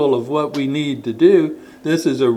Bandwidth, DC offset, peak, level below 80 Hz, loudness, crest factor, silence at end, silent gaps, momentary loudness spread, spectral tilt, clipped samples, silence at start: 13 kHz; under 0.1%; -2 dBFS; -62 dBFS; -17 LUFS; 16 dB; 0 s; none; 10 LU; -6.5 dB/octave; under 0.1%; 0 s